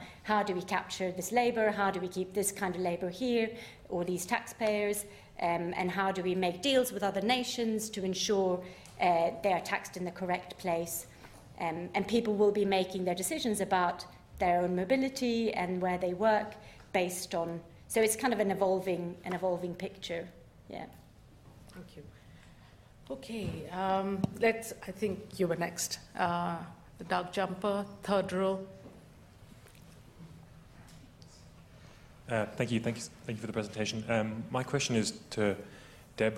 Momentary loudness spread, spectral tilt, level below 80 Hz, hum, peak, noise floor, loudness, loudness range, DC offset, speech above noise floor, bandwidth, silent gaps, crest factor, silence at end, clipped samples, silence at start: 16 LU; -4.5 dB/octave; -62 dBFS; none; -14 dBFS; -56 dBFS; -33 LUFS; 8 LU; under 0.1%; 24 dB; 16 kHz; none; 20 dB; 0 s; under 0.1%; 0 s